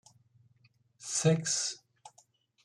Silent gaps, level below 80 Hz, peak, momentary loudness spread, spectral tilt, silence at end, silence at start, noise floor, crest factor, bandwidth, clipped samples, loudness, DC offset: none; -74 dBFS; -14 dBFS; 19 LU; -4 dB/octave; 0.55 s; 1 s; -68 dBFS; 22 dB; 12 kHz; under 0.1%; -30 LUFS; under 0.1%